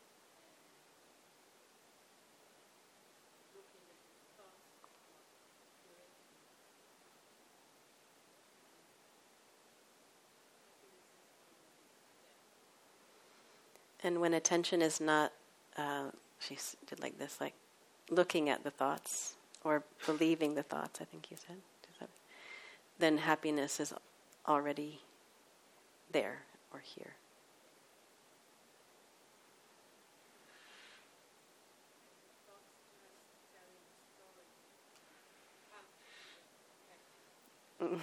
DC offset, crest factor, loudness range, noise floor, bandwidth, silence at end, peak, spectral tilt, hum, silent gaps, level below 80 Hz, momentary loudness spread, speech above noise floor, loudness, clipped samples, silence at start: under 0.1%; 28 dB; 26 LU; -67 dBFS; 16 kHz; 0 s; -16 dBFS; -3.5 dB/octave; none; none; under -90 dBFS; 28 LU; 30 dB; -37 LUFS; under 0.1%; 3.55 s